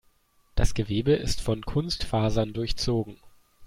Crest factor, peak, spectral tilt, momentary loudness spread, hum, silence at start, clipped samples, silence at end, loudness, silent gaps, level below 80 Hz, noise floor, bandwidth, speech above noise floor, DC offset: 20 dB; -6 dBFS; -5.5 dB/octave; 5 LU; none; 0.55 s; under 0.1%; 0 s; -28 LUFS; none; -34 dBFS; -64 dBFS; 15.5 kHz; 39 dB; under 0.1%